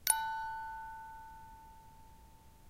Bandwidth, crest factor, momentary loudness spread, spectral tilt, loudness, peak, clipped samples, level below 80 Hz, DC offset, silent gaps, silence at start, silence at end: 16 kHz; 30 dB; 27 LU; 1 dB/octave; -38 LUFS; -10 dBFS; under 0.1%; -62 dBFS; under 0.1%; none; 0 s; 0 s